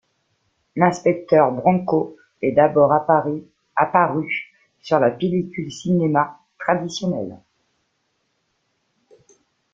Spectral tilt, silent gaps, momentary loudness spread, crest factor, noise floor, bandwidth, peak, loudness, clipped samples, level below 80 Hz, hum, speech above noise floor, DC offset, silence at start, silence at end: -7 dB/octave; none; 13 LU; 20 dB; -70 dBFS; 7.6 kHz; -2 dBFS; -20 LUFS; under 0.1%; -62 dBFS; none; 52 dB; under 0.1%; 0.75 s; 2.35 s